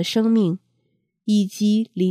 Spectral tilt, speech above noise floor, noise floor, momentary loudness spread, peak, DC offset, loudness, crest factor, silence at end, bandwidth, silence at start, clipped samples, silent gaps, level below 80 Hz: -6.5 dB/octave; 51 dB; -70 dBFS; 10 LU; -8 dBFS; under 0.1%; -20 LUFS; 14 dB; 0 s; 14 kHz; 0 s; under 0.1%; none; -72 dBFS